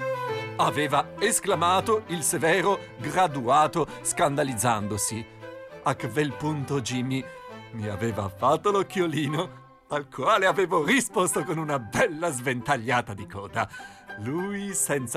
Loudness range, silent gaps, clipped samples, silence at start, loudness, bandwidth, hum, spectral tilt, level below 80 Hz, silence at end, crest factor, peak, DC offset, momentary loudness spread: 5 LU; none; under 0.1%; 0 s; -26 LUFS; 16 kHz; none; -4 dB/octave; -60 dBFS; 0 s; 14 dB; -12 dBFS; under 0.1%; 12 LU